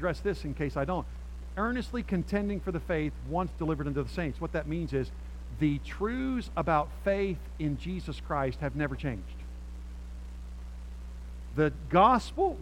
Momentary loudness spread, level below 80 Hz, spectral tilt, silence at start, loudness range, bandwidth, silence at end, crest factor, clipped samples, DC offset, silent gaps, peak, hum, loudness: 16 LU; -40 dBFS; -7.5 dB/octave; 0 s; 5 LU; 13.5 kHz; 0 s; 22 dB; under 0.1%; under 0.1%; none; -10 dBFS; none; -31 LUFS